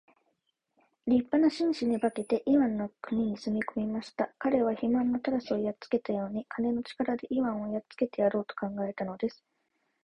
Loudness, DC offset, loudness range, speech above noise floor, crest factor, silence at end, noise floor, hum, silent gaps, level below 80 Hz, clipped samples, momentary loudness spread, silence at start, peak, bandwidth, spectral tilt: -30 LUFS; under 0.1%; 3 LU; 49 dB; 18 dB; 0.7 s; -78 dBFS; none; none; -66 dBFS; under 0.1%; 8 LU; 1.05 s; -14 dBFS; 10.5 kHz; -7 dB/octave